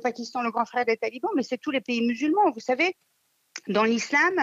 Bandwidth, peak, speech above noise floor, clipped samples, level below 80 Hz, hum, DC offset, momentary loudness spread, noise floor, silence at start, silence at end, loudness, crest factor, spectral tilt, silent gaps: 7.8 kHz; -10 dBFS; 21 dB; under 0.1%; -82 dBFS; none; under 0.1%; 7 LU; -46 dBFS; 0 s; 0 s; -25 LUFS; 14 dB; -4 dB/octave; none